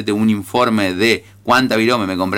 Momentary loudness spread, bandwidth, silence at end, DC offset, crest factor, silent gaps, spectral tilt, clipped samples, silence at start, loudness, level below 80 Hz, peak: 3 LU; 16.5 kHz; 0 s; under 0.1%; 12 dB; none; -5 dB/octave; under 0.1%; 0 s; -16 LUFS; -54 dBFS; -4 dBFS